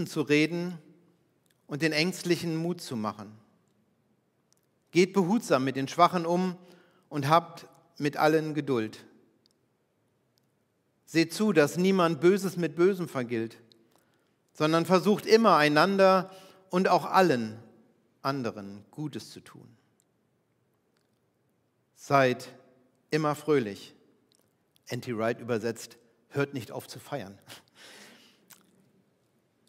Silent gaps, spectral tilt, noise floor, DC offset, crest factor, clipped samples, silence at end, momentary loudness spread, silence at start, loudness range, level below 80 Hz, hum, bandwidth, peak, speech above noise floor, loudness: none; -5.5 dB/octave; -73 dBFS; under 0.1%; 22 dB; under 0.1%; 2.1 s; 18 LU; 0 s; 14 LU; -82 dBFS; none; 16 kHz; -6 dBFS; 46 dB; -27 LUFS